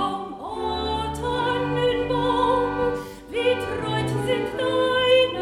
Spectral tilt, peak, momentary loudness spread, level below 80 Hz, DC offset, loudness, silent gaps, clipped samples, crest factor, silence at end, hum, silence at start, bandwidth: -5.5 dB/octave; -6 dBFS; 9 LU; -44 dBFS; under 0.1%; -23 LUFS; none; under 0.1%; 16 dB; 0 s; none; 0 s; 13.5 kHz